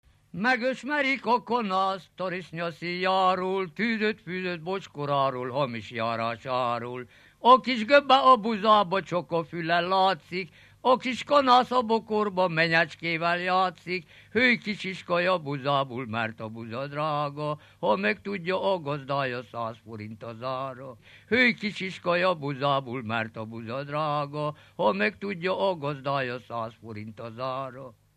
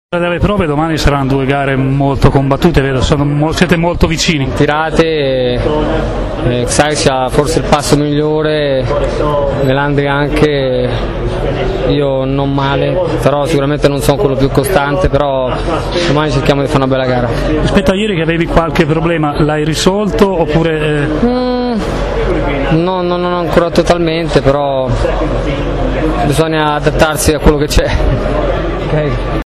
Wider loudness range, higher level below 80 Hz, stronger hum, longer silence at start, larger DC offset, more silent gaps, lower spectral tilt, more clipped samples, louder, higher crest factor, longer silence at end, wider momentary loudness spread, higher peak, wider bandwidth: first, 7 LU vs 2 LU; second, -70 dBFS vs -22 dBFS; neither; first, 0.35 s vs 0.1 s; neither; neither; about the same, -6 dB/octave vs -6 dB/octave; second, under 0.1% vs 0.2%; second, -26 LUFS vs -12 LUFS; first, 22 dB vs 12 dB; first, 0.25 s vs 0 s; first, 14 LU vs 4 LU; second, -4 dBFS vs 0 dBFS; second, 12.5 kHz vs 14 kHz